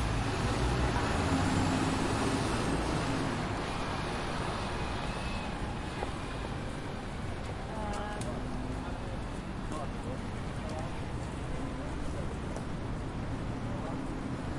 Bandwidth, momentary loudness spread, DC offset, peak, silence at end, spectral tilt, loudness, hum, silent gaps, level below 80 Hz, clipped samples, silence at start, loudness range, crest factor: 11.5 kHz; 8 LU; under 0.1%; -18 dBFS; 0 s; -5.5 dB/octave; -35 LUFS; none; none; -42 dBFS; under 0.1%; 0 s; 7 LU; 16 dB